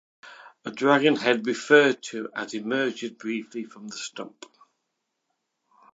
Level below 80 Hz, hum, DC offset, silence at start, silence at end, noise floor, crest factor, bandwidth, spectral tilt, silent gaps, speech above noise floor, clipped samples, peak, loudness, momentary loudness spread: -82 dBFS; none; under 0.1%; 0.25 s; 1.65 s; -80 dBFS; 24 dB; 8 kHz; -4 dB/octave; none; 55 dB; under 0.1%; -2 dBFS; -24 LUFS; 19 LU